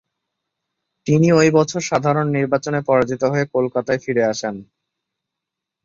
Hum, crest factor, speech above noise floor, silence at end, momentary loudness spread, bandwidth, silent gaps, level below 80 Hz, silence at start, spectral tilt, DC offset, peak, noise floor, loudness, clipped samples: none; 18 dB; 66 dB; 1.2 s; 9 LU; 7.6 kHz; none; -56 dBFS; 1.05 s; -6 dB/octave; under 0.1%; -2 dBFS; -83 dBFS; -18 LUFS; under 0.1%